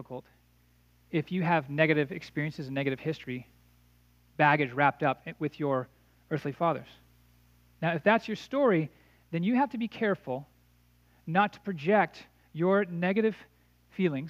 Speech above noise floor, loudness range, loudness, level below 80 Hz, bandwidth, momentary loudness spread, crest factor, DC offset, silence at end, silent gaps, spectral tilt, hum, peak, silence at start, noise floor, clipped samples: 35 dB; 2 LU; -29 LUFS; -68 dBFS; 15 kHz; 13 LU; 22 dB; under 0.1%; 0 s; none; -7.5 dB/octave; 60 Hz at -60 dBFS; -8 dBFS; 0 s; -64 dBFS; under 0.1%